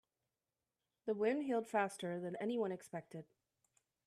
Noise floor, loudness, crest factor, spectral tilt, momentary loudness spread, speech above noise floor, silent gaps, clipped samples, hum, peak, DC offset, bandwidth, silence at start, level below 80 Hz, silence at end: under -90 dBFS; -40 LUFS; 20 dB; -6 dB/octave; 12 LU; over 50 dB; none; under 0.1%; none; -22 dBFS; under 0.1%; 13.5 kHz; 1.05 s; -88 dBFS; 0.85 s